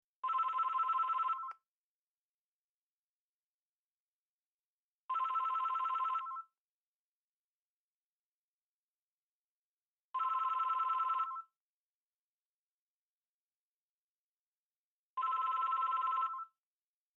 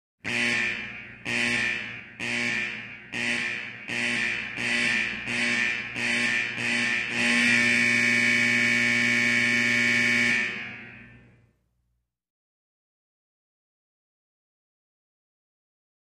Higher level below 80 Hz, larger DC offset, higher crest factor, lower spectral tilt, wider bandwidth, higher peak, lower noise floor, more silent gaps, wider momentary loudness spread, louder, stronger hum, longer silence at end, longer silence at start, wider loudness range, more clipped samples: second, under -90 dBFS vs -62 dBFS; neither; about the same, 14 dB vs 18 dB; second, 1 dB/octave vs -2.5 dB/octave; second, 7.2 kHz vs 13.5 kHz; second, -28 dBFS vs -10 dBFS; first, under -90 dBFS vs -76 dBFS; first, 1.68-5.09 s, 6.58-10.14 s, 11.57-15.17 s vs none; about the same, 12 LU vs 12 LU; second, -36 LUFS vs -23 LUFS; second, none vs 60 Hz at -50 dBFS; second, 0.7 s vs 4.95 s; about the same, 0.25 s vs 0.25 s; about the same, 9 LU vs 7 LU; neither